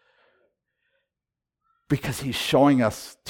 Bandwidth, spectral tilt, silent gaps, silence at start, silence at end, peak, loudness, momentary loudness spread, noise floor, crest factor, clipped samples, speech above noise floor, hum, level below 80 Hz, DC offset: 18 kHz; -5.5 dB/octave; none; 1.9 s; 0 s; -8 dBFS; -23 LUFS; 10 LU; -88 dBFS; 18 dB; under 0.1%; 65 dB; none; -54 dBFS; under 0.1%